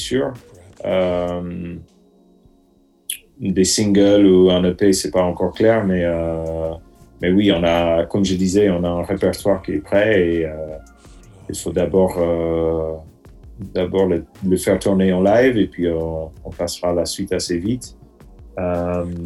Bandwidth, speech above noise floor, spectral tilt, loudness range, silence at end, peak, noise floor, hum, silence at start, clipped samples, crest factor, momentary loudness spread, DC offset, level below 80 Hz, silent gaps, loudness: 13 kHz; 38 dB; -5.5 dB/octave; 7 LU; 0 s; -2 dBFS; -56 dBFS; none; 0 s; under 0.1%; 16 dB; 15 LU; under 0.1%; -42 dBFS; none; -18 LUFS